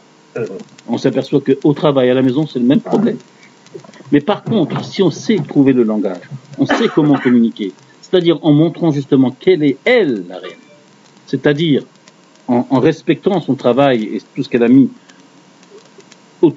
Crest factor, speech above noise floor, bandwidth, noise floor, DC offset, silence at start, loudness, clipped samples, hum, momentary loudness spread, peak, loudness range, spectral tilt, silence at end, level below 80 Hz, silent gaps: 14 dB; 32 dB; 7.8 kHz; -46 dBFS; under 0.1%; 0.35 s; -14 LUFS; under 0.1%; none; 13 LU; 0 dBFS; 3 LU; -7 dB/octave; 0 s; -60 dBFS; none